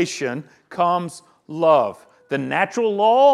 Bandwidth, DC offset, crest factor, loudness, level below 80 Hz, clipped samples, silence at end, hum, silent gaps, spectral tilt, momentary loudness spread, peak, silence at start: 12.5 kHz; under 0.1%; 16 dB; -20 LUFS; -72 dBFS; under 0.1%; 0 s; none; none; -5 dB/octave; 17 LU; -4 dBFS; 0 s